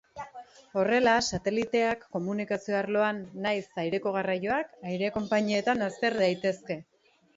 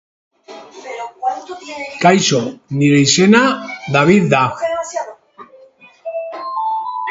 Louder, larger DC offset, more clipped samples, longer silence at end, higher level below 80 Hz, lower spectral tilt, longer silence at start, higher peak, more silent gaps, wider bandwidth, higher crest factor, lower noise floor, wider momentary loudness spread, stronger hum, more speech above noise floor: second, -29 LUFS vs -15 LUFS; neither; neither; first, 0.55 s vs 0 s; second, -62 dBFS vs -56 dBFS; about the same, -4.5 dB/octave vs -4.5 dB/octave; second, 0.15 s vs 0.5 s; second, -10 dBFS vs 0 dBFS; neither; about the same, 8 kHz vs 8 kHz; about the same, 18 dB vs 16 dB; about the same, -48 dBFS vs -45 dBFS; second, 11 LU vs 18 LU; neither; second, 20 dB vs 31 dB